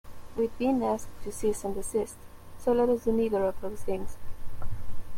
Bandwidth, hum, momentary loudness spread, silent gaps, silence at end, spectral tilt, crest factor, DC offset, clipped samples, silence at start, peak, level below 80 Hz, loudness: 16 kHz; none; 18 LU; none; 0 s; -6 dB/octave; 14 dB; under 0.1%; under 0.1%; 0.05 s; -14 dBFS; -42 dBFS; -30 LUFS